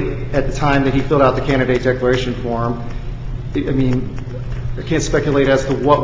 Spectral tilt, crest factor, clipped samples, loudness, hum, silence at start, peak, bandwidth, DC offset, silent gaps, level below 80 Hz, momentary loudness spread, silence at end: -6.5 dB/octave; 16 dB; under 0.1%; -17 LUFS; none; 0 s; 0 dBFS; 7.8 kHz; under 0.1%; none; -28 dBFS; 12 LU; 0 s